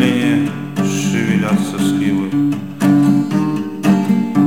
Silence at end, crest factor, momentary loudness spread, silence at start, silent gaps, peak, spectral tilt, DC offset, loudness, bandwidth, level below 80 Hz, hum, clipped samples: 0 s; 14 dB; 6 LU; 0 s; none; 0 dBFS; -6 dB/octave; 0.6%; -16 LUFS; 16 kHz; -58 dBFS; none; under 0.1%